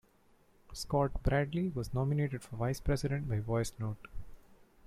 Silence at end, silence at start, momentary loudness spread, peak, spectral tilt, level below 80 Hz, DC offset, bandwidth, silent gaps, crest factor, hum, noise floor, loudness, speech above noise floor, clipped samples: 0.25 s; 0.7 s; 13 LU; -18 dBFS; -6.5 dB/octave; -46 dBFS; under 0.1%; 15 kHz; none; 16 dB; none; -66 dBFS; -35 LUFS; 33 dB; under 0.1%